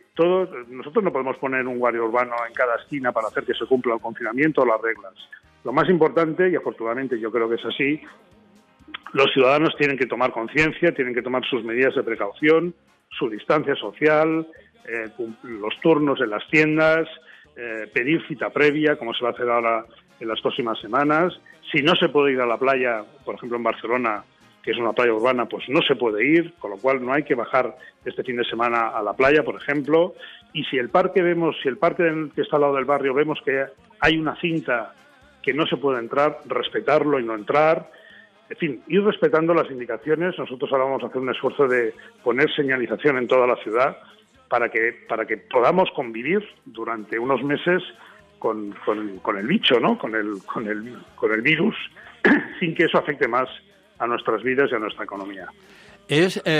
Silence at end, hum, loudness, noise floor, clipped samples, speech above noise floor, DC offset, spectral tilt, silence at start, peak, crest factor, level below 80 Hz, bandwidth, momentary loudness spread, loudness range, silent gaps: 0 s; none; -22 LUFS; -54 dBFS; under 0.1%; 32 dB; under 0.1%; -6 dB/octave; 0.15 s; -6 dBFS; 16 dB; -60 dBFS; 10.5 kHz; 11 LU; 2 LU; none